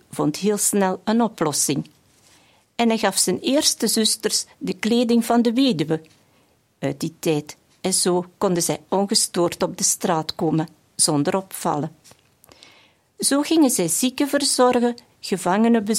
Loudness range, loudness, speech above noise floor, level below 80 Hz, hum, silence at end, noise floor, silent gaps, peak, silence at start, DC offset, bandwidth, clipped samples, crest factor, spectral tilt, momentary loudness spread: 4 LU; -20 LUFS; 40 dB; -64 dBFS; none; 0 s; -60 dBFS; none; -4 dBFS; 0.15 s; under 0.1%; 16.5 kHz; under 0.1%; 16 dB; -3.5 dB/octave; 9 LU